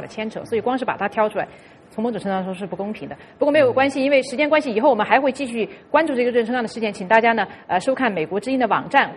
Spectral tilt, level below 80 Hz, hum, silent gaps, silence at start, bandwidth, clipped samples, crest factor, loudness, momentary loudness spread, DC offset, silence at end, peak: -5.5 dB/octave; -60 dBFS; none; none; 0 s; 11.5 kHz; under 0.1%; 20 dB; -20 LUFS; 12 LU; under 0.1%; 0 s; 0 dBFS